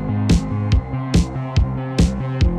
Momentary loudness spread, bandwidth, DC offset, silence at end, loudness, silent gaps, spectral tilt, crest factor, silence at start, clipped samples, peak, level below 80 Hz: 3 LU; 11.5 kHz; under 0.1%; 0 s; -20 LUFS; none; -7 dB/octave; 12 dB; 0 s; under 0.1%; -6 dBFS; -22 dBFS